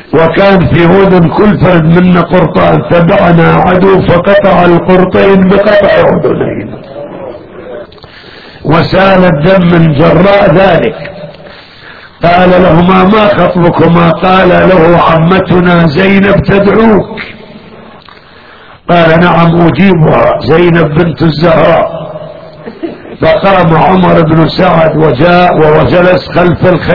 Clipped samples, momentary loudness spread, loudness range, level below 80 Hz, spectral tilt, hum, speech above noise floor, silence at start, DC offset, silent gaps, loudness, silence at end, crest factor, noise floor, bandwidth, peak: 5%; 17 LU; 4 LU; -28 dBFS; -9.5 dB/octave; none; 29 dB; 0 s; 4%; none; -5 LUFS; 0 s; 6 dB; -33 dBFS; 5.4 kHz; 0 dBFS